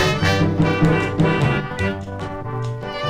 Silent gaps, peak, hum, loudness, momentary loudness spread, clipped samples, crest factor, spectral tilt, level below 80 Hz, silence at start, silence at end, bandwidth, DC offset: none; -4 dBFS; none; -20 LUFS; 10 LU; under 0.1%; 16 dB; -6.5 dB/octave; -36 dBFS; 0 s; 0 s; 12.5 kHz; under 0.1%